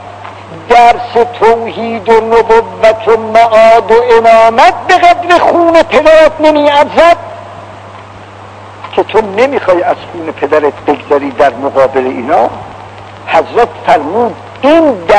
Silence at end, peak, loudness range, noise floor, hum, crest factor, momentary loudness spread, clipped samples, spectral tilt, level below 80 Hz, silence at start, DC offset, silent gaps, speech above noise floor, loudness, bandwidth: 0 s; 0 dBFS; 6 LU; -29 dBFS; none; 8 dB; 21 LU; 8%; -5 dB/octave; -38 dBFS; 0 s; under 0.1%; none; 22 dB; -8 LUFS; 11 kHz